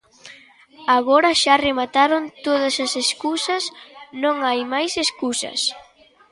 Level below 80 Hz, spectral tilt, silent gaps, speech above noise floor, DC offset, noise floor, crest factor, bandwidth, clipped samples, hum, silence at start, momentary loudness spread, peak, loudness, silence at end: -60 dBFS; -1 dB/octave; none; 28 dB; under 0.1%; -47 dBFS; 18 dB; 11.5 kHz; under 0.1%; none; 0.25 s; 9 LU; -2 dBFS; -19 LUFS; 0.5 s